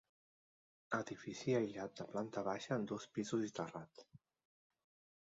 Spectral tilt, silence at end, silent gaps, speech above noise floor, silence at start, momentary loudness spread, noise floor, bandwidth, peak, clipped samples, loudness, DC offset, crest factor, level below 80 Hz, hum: -5.5 dB/octave; 1.05 s; none; over 48 dB; 0.9 s; 9 LU; under -90 dBFS; 7.6 kHz; -24 dBFS; under 0.1%; -43 LUFS; under 0.1%; 20 dB; -80 dBFS; none